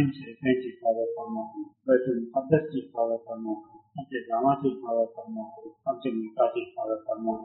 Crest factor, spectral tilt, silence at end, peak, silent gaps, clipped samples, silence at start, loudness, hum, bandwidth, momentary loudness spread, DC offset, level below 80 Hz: 20 dB; -6.5 dB/octave; 0 s; -8 dBFS; none; under 0.1%; 0 s; -29 LUFS; none; 4 kHz; 13 LU; under 0.1%; -70 dBFS